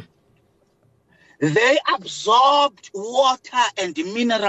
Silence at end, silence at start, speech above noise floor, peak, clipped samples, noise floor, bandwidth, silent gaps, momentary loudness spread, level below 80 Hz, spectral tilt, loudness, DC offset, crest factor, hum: 0 s; 0 s; 43 dB; -6 dBFS; under 0.1%; -61 dBFS; 8.4 kHz; none; 10 LU; -68 dBFS; -3.5 dB/octave; -19 LUFS; under 0.1%; 16 dB; none